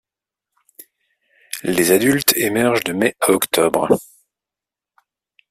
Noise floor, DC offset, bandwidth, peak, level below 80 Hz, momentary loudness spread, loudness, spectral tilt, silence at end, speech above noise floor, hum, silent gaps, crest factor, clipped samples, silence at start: -88 dBFS; under 0.1%; 16 kHz; 0 dBFS; -58 dBFS; 6 LU; -17 LUFS; -3.5 dB/octave; 1.5 s; 71 dB; none; none; 20 dB; under 0.1%; 1.55 s